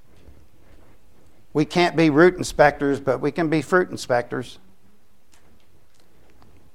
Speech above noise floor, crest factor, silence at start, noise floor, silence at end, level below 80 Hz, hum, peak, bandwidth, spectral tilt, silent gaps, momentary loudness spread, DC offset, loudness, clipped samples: 41 dB; 22 dB; 1.55 s; -60 dBFS; 2.25 s; -50 dBFS; none; -2 dBFS; 14 kHz; -5.5 dB/octave; none; 11 LU; 0.7%; -20 LUFS; under 0.1%